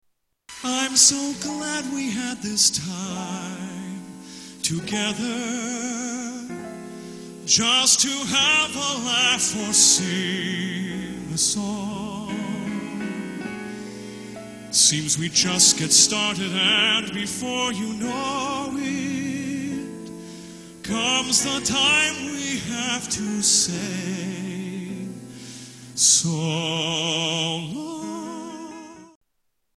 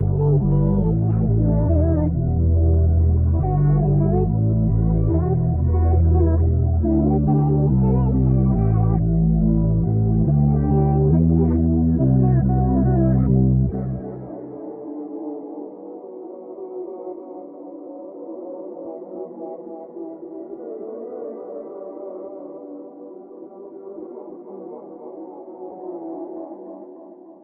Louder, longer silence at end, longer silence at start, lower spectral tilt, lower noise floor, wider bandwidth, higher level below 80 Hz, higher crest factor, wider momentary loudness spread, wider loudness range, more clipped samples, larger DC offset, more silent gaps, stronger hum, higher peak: second, -21 LUFS vs -18 LUFS; first, 0.7 s vs 0.1 s; first, 0.5 s vs 0 s; second, -1.5 dB/octave vs -15 dB/octave; first, -72 dBFS vs -42 dBFS; first, 13.5 kHz vs 2.1 kHz; second, -58 dBFS vs -28 dBFS; first, 22 dB vs 14 dB; about the same, 21 LU vs 19 LU; second, 10 LU vs 18 LU; neither; neither; neither; neither; first, -2 dBFS vs -6 dBFS